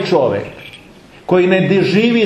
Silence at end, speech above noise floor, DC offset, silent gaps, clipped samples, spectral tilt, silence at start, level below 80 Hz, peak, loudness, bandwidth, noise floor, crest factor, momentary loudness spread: 0 s; 28 dB; under 0.1%; none; under 0.1%; -7 dB/octave; 0 s; -52 dBFS; 0 dBFS; -14 LUFS; 9 kHz; -41 dBFS; 14 dB; 21 LU